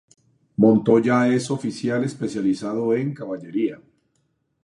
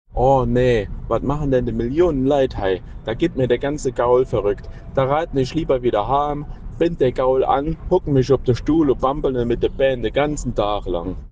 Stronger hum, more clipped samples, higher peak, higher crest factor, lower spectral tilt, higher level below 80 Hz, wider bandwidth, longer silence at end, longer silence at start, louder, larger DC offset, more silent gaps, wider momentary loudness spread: neither; neither; about the same, -4 dBFS vs -4 dBFS; about the same, 18 dB vs 14 dB; about the same, -7 dB/octave vs -7 dB/octave; second, -64 dBFS vs -32 dBFS; first, 11 kHz vs 9.4 kHz; first, 0.9 s vs 0 s; first, 0.6 s vs 0.15 s; about the same, -21 LUFS vs -20 LUFS; neither; neither; first, 11 LU vs 7 LU